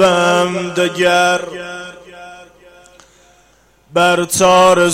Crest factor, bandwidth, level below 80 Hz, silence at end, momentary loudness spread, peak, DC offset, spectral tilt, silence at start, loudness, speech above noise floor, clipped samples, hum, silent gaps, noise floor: 14 dB; 16 kHz; -52 dBFS; 0 s; 23 LU; -2 dBFS; under 0.1%; -3.5 dB/octave; 0 s; -13 LUFS; 39 dB; under 0.1%; none; none; -52 dBFS